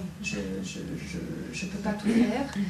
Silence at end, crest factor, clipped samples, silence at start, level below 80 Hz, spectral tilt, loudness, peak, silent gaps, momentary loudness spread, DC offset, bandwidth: 0 s; 18 dB; under 0.1%; 0 s; -50 dBFS; -5.5 dB/octave; -30 LUFS; -12 dBFS; none; 11 LU; under 0.1%; 13.5 kHz